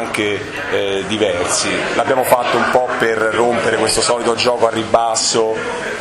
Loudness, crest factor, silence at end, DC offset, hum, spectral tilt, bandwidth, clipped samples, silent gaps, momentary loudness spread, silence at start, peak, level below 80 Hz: -15 LUFS; 16 dB; 0 s; under 0.1%; none; -2.5 dB/octave; 15 kHz; under 0.1%; none; 5 LU; 0 s; 0 dBFS; -46 dBFS